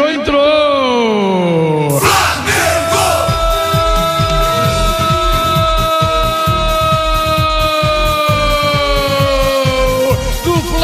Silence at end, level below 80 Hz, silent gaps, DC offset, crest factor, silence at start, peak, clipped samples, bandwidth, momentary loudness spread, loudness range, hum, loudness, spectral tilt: 0 s; -22 dBFS; none; under 0.1%; 12 dB; 0 s; 0 dBFS; under 0.1%; 16 kHz; 2 LU; 1 LU; none; -12 LUFS; -4.5 dB/octave